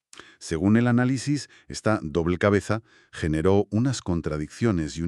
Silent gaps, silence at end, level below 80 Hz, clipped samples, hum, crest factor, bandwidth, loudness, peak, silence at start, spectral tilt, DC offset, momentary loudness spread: none; 0 s; -46 dBFS; under 0.1%; none; 20 dB; 11.5 kHz; -24 LUFS; -4 dBFS; 0.4 s; -6.5 dB/octave; under 0.1%; 10 LU